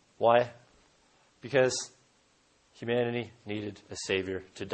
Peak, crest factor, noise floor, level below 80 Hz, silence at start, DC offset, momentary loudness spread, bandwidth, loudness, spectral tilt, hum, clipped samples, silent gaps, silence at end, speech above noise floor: -10 dBFS; 22 dB; -67 dBFS; -70 dBFS; 0.2 s; under 0.1%; 15 LU; 8.8 kHz; -30 LUFS; -4 dB/octave; none; under 0.1%; none; 0 s; 37 dB